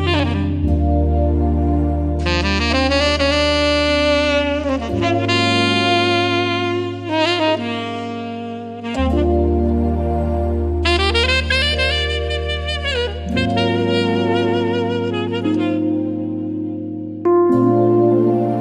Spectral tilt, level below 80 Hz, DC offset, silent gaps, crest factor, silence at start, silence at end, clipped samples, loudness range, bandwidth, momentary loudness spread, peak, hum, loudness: -6 dB/octave; -26 dBFS; under 0.1%; none; 14 dB; 0 s; 0 s; under 0.1%; 4 LU; 10.5 kHz; 8 LU; -2 dBFS; none; -17 LUFS